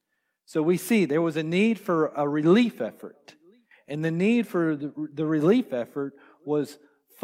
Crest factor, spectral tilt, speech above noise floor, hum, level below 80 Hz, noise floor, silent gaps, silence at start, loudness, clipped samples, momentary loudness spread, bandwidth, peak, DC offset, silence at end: 18 dB; -6.5 dB/octave; 40 dB; none; -76 dBFS; -64 dBFS; none; 0.5 s; -25 LUFS; under 0.1%; 13 LU; 16 kHz; -8 dBFS; under 0.1%; 0.5 s